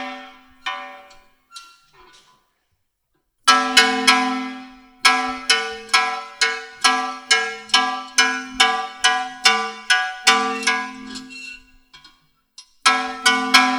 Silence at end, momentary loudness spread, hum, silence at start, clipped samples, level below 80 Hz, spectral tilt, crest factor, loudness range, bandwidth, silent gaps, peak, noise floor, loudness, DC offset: 0 s; 18 LU; none; 0 s; under 0.1%; -60 dBFS; 0.5 dB/octave; 22 dB; 5 LU; over 20 kHz; none; 0 dBFS; -71 dBFS; -17 LUFS; under 0.1%